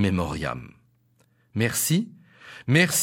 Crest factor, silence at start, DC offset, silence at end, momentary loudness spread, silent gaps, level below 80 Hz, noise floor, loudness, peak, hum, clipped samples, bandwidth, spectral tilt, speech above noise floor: 18 dB; 0 s; under 0.1%; 0 s; 17 LU; none; -50 dBFS; -64 dBFS; -24 LUFS; -8 dBFS; none; under 0.1%; 16.5 kHz; -4 dB/octave; 40 dB